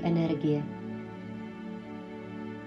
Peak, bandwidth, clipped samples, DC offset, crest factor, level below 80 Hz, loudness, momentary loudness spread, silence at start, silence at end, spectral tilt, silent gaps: -18 dBFS; 6.6 kHz; under 0.1%; under 0.1%; 16 dB; -64 dBFS; -34 LUFS; 13 LU; 0 s; 0 s; -9 dB/octave; none